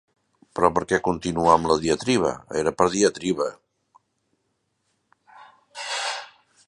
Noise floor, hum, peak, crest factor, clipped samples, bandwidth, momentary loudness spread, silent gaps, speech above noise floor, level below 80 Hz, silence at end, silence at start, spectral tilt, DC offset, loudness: -74 dBFS; none; -2 dBFS; 24 dB; under 0.1%; 11.5 kHz; 11 LU; none; 52 dB; -52 dBFS; 0.4 s; 0.55 s; -4 dB/octave; under 0.1%; -23 LUFS